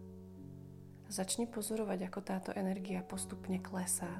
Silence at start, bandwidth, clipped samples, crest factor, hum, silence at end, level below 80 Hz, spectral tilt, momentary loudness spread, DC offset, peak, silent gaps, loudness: 0 s; 15 kHz; under 0.1%; 18 dB; none; 0 s; -68 dBFS; -4.5 dB/octave; 16 LU; under 0.1%; -22 dBFS; none; -39 LUFS